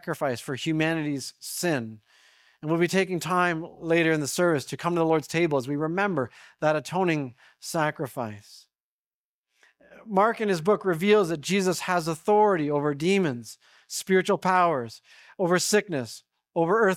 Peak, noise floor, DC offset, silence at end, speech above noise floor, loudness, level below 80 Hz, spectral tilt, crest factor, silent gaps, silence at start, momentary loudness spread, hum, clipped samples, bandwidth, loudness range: -8 dBFS; under -90 dBFS; under 0.1%; 0 s; over 65 dB; -25 LUFS; -66 dBFS; -5 dB/octave; 18 dB; 8.80-9.44 s; 0.05 s; 12 LU; none; under 0.1%; 17 kHz; 6 LU